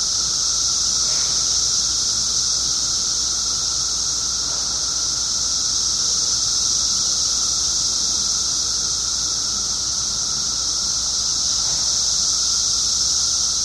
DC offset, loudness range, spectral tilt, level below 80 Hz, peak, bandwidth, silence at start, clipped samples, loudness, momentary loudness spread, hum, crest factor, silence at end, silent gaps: under 0.1%; 2 LU; 1 dB/octave; -42 dBFS; -6 dBFS; 14 kHz; 0 s; under 0.1%; -17 LUFS; 3 LU; none; 14 dB; 0 s; none